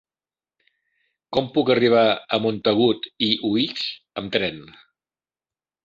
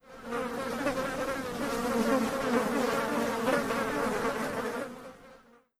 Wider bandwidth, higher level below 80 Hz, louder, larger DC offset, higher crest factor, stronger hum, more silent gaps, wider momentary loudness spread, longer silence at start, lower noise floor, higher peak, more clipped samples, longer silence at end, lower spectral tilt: second, 7.6 kHz vs 16 kHz; second, -60 dBFS vs -54 dBFS; first, -21 LUFS vs -31 LUFS; neither; about the same, 20 dB vs 18 dB; neither; neither; first, 11 LU vs 8 LU; first, 1.3 s vs 0.05 s; first, under -90 dBFS vs -57 dBFS; first, -4 dBFS vs -14 dBFS; neither; first, 1.25 s vs 0.45 s; first, -6.5 dB/octave vs -4.5 dB/octave